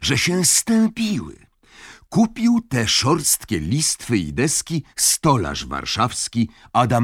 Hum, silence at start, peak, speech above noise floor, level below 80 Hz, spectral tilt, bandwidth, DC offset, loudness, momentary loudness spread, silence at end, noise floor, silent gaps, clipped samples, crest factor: none; 0 s; -2 dBFS; 26 dB; -44 dBFS; -3.5 dB/octave; 17 kHz; under 0.1%; -19 LUFS; 9 LU; 0 s; -46 dBFS; none; under 0.1%; 18 dB